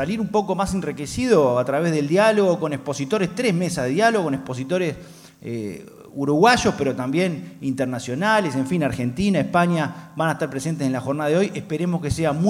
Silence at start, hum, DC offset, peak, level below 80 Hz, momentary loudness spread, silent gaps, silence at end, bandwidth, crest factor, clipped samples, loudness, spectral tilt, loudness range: 0 s; none; under 0.1%; -2 dBFS; -48 dBFS; 10 LU; none; 0 s; 15.5 kHz; 18 dB; under 0.1%; -21 LUFS; -6 dB/octave; 3 LU